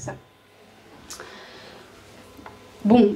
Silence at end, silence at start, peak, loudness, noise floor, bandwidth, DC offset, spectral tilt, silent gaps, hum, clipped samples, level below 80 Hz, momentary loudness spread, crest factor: 0 s; 0 s; -4 dBFS; -23 LUFS; -53 dBFS; 12.5 kHz; under 0.1%; -6.5 dB/octave; none; none; under 0.1%; -58 dBFS; 26 LU; 22 dB